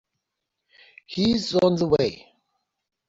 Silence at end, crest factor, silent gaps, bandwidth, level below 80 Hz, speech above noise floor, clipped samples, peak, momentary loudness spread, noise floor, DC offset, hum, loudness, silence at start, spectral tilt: 0.95 s; 18 dB; none; 7.8 kHz; -56 dBFS; 60 dB; under 0.1%; -8 dBFS; 7 LU; -82 dBFS; under 0.1%; none; -22 LUFS; 1.1 s; -6 dB/octave